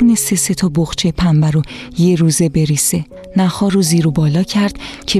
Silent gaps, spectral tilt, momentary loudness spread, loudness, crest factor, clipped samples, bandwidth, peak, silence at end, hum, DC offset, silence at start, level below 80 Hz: none; -5 dB/octave; 6 LU; -14 LUFS; 10 dB; under 0.1%; 14.5 kHz; -4 dBFS; 0 s; none; under 0.1%; 0 s; -36 dBFS